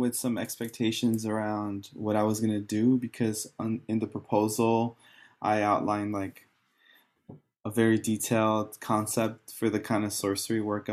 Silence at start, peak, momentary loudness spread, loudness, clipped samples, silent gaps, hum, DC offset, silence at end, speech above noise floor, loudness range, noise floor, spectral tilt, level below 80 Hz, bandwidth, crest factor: 0 s; -12 dBFS; 8 LU; -29 LUFS; under 0.1%; none; none; under 0.1%; 0 s; 35 dB; 2 LU; -64 dBFS; -5 dB/octave; -72 dBFS; 14.5 kHz; 18 dB